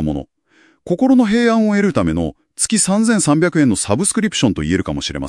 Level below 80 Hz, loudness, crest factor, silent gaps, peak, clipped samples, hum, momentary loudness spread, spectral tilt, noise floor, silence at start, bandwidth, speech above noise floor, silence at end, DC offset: -42 dBFS; -15 LUFS; 16 dB; none; 0 dBFS; under 0.1%; none; 9 LU; -4.5 dB/octave; -54 dBFS; 0 s; 12 kHz; 39 dB; 0 s; under 0.1%